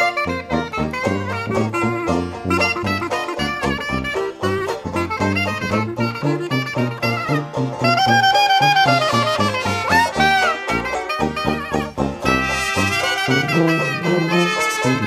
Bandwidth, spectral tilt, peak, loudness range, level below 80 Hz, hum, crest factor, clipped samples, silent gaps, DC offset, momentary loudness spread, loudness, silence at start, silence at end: 15.5 kHz; -4.5 dB/octave; -2 dBFS; 6 LU; -42 dBFS; none; 18 dB; under 0.1%; none; under 0.1%; 8 LU; -18 LUFS; 0 s; 0 s